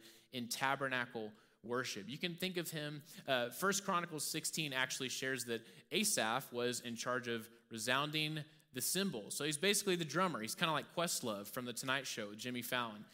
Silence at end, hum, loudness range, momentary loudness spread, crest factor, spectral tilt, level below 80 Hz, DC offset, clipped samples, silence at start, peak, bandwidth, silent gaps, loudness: 0.05 s; none; 3 LU; 10 LU; 24 dB; -2.5 dB/octave; -84 dBFS; under 0.1%; under 0.1%; 0 s; -16 dBFS; 16 kHz; none; -39 LUFS